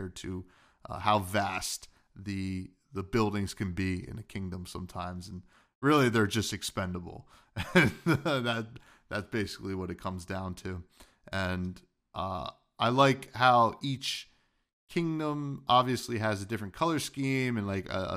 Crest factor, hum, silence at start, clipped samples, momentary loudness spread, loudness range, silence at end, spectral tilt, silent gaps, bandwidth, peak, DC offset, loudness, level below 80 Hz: 24 dB; none; 0 s; under 0.1%; 16 LU; 7 LU; 0 s; -5 dB/octave; 5.75-5.81 s, 14.73-14.87 s; 15.5 kHz; -8 dBFS; under 0.1%; -31 LUFS; -56 dBFS